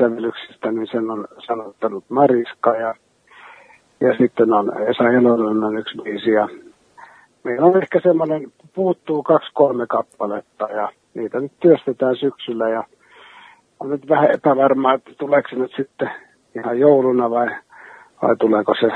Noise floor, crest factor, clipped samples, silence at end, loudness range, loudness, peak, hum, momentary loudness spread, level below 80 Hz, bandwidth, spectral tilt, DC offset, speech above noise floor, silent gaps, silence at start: -47 dBFS; 18 dB; under 0.1%; 0 s; 3 LU; -18 LUFS; 0 dBFS; none; 12 LU; -68 dBFS; 4.2 kHz; -8 dB/octave; under 0.1%; 30 dB; none; 0 s